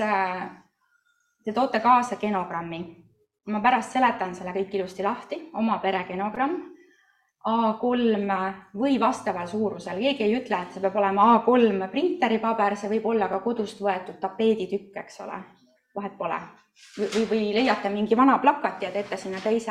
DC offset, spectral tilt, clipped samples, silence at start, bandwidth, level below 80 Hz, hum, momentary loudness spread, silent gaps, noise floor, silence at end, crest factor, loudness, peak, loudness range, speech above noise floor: under 0.1%; -5.5 dB/octave; under 0.1%; 0 s; 11 kHz; -68 dBFS; none; 14 LU; none; -68 dBFS; 0 s; 18 dB; -25 LUFS; -6 dBFS; 6 LU; 44 dB